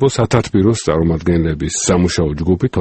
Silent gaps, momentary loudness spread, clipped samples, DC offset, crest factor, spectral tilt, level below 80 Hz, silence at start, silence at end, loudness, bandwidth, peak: none; 3 LU; under 0.1%; under 0.1%; 14 dB; -5.5 dB/octave; -30 dBFS; 0 s; 0 s; -15 LUFS; 8.8 kHz; 0 dBFS